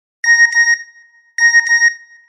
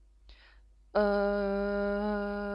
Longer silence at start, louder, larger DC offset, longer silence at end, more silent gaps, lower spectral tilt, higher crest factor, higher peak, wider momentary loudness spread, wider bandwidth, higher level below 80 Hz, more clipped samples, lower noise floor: about the same, 0.25 s vs 0.3 s; first, -10 LUFS vs -31 LUFS; neither; first, 0.3 s vs 0 s; neither; second, 12 dB/octave vs -8.5 dB/octave; about the same, 12 dB vs 16 dB; first, -2 dBFS vs -16 dBFS; about the same, 7 LU vs 5 LU; about the same, 10 kHz vs 11 kHz; second, under -90 dBFS vs -50 dBFS; neither; second, -47 dBFS vs -59 dBFS